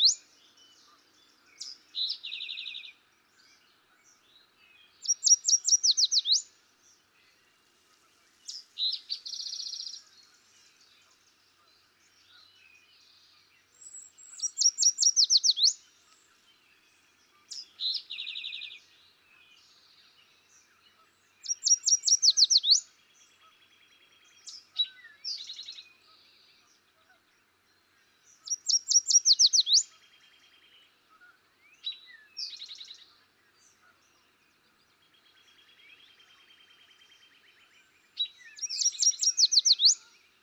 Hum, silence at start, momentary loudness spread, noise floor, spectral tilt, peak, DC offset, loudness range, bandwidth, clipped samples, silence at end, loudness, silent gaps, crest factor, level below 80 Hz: none; 0 s; 24 LU; -68 dBFS; 6 dB/octave; -10 dBFS; under 0.1%; 19 LU; 18.5 kHz; under 0.1%; 0.45 s; -24 LUFS; none; 22 dB; under -90 dBFS